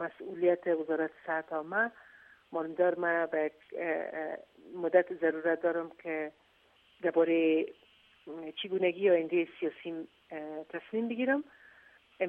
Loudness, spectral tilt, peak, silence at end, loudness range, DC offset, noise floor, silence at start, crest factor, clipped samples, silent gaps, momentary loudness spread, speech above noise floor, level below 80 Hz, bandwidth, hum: -32 LUFS; -7.5 dB/octave; -12 dBFS; 0 s; 3 LU; under 0.1%; -66 dBFS; 0 s; 20 dB; under 0.1%; none; 14 LU; 34 dB; -82 dBFS; 4 kHz; none